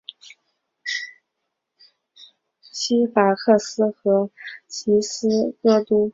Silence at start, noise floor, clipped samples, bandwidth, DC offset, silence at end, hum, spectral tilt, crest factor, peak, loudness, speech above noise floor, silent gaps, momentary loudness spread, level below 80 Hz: 0.85 s; -79 dBFS; under 0.1%; 7.8 kHz; under 0.1%; 0.05 s; none; -4.5 dB/octave; 20 dB; -2 dBFS; -20 LUFS; 59 dB; none; 16 LU; -66 dBFS